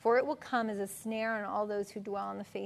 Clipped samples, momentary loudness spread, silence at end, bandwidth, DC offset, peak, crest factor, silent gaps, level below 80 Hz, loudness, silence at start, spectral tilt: under 0.1%; 8 LU; 0 s; 13.5 kHz; under 0.1%; -18 dBFS; 16 dB; none; -76 dBFS; -35 LUFS; 0 s; -5 dB/octave